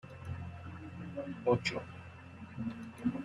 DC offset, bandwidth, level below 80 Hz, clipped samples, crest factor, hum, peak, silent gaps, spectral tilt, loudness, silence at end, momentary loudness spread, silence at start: under 0.1%; 11.5 kHz; -64 dBFS; under 0.1%; 22 dB; none; -18 dBFS; none; -6.5 dB/octave; -39 LUFS; 0 s; 17 LU; 0.05 s